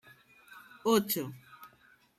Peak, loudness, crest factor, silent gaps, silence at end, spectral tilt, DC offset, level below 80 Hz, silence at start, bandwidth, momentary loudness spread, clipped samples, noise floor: -14 dBFS; -31 LUFS; 22 dB; none; 0.5 s; -4 dB/octave; under 0.1%; -76 dBFS; 0.5 s; 16 kHz; 25 LU; under 0.1%; -64 dBFS